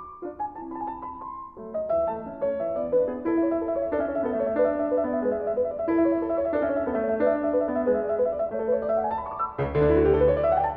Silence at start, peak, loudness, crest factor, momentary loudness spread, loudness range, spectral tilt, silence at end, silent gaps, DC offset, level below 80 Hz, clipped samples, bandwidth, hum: 0 s; -10 dBFS; -25 LUFS; 14 dB; 13 LU; 4 LU; -11 dB/octave; 0 s; none; under 0.1%; -44 dBFS; under 0.1%; 4.5 kHz; none